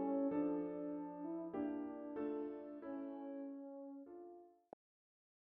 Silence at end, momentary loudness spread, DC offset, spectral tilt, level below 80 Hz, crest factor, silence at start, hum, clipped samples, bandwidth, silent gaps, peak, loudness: 0.9 s; 20 LU; under 0.1%; -8 dB/octave; -82 dBFS; 16 dB; 0 s; none; under 0.1%; 3.6 kHz; none; -30 dBFS; -45 LUFS